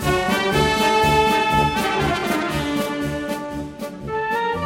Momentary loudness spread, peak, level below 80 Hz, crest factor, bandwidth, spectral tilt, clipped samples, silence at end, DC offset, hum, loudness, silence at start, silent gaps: 11 LU; -4 dBFS; -38 dBFS; 16 dB; 16.5 kHz; -4.5 dB/octave; under 0.1%; 0 s; under 0.1%; none; -20 LUFS; 0 s; none